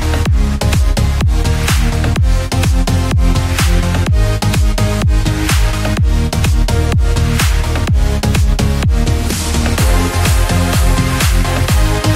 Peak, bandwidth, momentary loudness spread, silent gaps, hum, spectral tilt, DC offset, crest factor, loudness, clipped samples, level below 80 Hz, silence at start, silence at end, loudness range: 0 dBFS; 16.5 kHz; 2 LU; none; none; -5 dB/octave; under 0.1%; 10 dB; -14 LUFS; under 0.1%; -14 dBFS; 0 s; 0 s; 1 LU